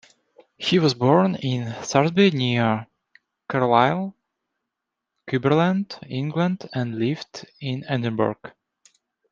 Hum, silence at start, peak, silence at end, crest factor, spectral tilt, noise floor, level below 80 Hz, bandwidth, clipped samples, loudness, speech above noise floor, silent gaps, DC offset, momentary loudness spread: none; 0.6 s; -2 dBFS; 0.85 s; 22 dB; -6 dB/octave; -83 dBFS; -64 dBFS; 7.6 kHz; under 0.1%; -22 LUFS; 62 dB; none; under 0.1%; 12 LU